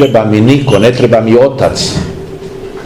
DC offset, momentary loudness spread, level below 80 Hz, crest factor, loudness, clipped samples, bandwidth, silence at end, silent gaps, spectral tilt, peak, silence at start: under 0.1%; 17 LU; -34 dBFS; 8 dB; -8 LUFS; 4%; 15.5 kHz; 0 s; none; -6 dB/octave; 0 dBFS; 0 s